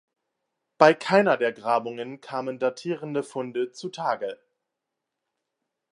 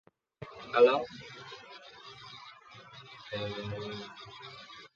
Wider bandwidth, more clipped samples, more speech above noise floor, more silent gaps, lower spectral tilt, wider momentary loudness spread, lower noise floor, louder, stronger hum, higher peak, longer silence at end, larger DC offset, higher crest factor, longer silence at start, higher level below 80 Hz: first, 11 kHz vs 7 kHz; neither; first, 60 dB vs 22 dB; neither; about the same, -5.5 dB/octave vs -5.5 dB/octave; second, 13 LU vs 25 LU; first, -84 dBFS vs -53 dBFS; first, -25 LUFS vs -31 LUFS; neither; first, -2 dBFS vs -10 dBFS; first, 1.6 s vs 0.1 s; neither; about the same, 24 dB vs 24 dB; first, 0.8 s vs 0.4 s; second, -78 dBFS vs -68 dBFS